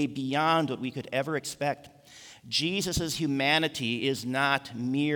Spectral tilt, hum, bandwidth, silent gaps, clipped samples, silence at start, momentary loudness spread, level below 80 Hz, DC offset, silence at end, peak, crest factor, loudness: -4 dB/octave; none; over 20 kHz; none; under 0.1%; 0 s; 8 LU; -54 dBFS; under 0.1%; 0 s; -8 dBFS; 20 dB; -28 LUFS